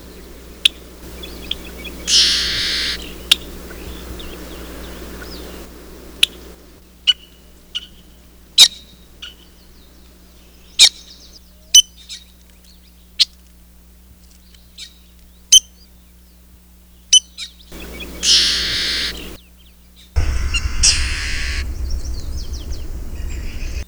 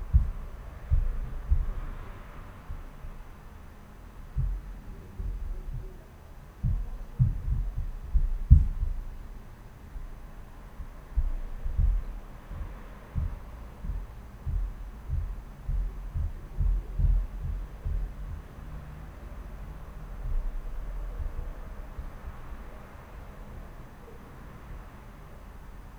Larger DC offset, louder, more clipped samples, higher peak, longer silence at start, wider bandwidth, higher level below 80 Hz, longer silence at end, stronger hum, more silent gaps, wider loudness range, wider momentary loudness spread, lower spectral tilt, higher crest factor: neither; first, -14 LUFS vs -35 LUFS; first, 0.1% vs under 0.1%; about the same, 0 dBFS vs -2 dBFS; about the same, 0 s vs 0 s; first, over 20 kHz vs 6.6 kHz; about the same, -30 dBFS vs -32 dBFS; about the same, 0.05 s vs 0 s; first, 60 Hz at -45 dBFS vs none; neither; second, 7 LU vs 13 LU; first, 26 LU vs 18 LU; second, 0 dB/octave vs -8.5 dB/octave; second, 20 dB vs 28 dB